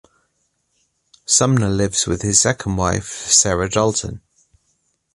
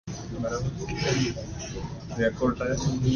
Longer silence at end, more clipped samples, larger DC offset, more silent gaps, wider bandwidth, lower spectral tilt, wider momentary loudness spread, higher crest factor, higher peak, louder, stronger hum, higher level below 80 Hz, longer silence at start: first, 0.95 s vs 0 s; neither; neither; neither; first, 11.5 kHz vs 10 kHz; second, -3.5 dB/octave vs -5.5 dB/octave; about the same, 11 LU vs 10 LU; about the same, 20 dB vs 16 dB; first, 0 dBFS vs -12 dBFS; first, -16 LUFS vs -29 LUFS; neither; about the same, -40 dBFS vs -42 dBFS; first, 1.3 s vs 0.05 s